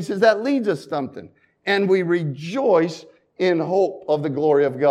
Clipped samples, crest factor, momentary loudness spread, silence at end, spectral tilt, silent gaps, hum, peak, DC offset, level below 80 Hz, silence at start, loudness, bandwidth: under 0.1%; 18 dB; 10 LU; 0 s; -6.5 dB/octave; none; none; -4 dBFS; under 0.1%; -72 dBFS; 0 s; -20 LUFS; 11.5 kHz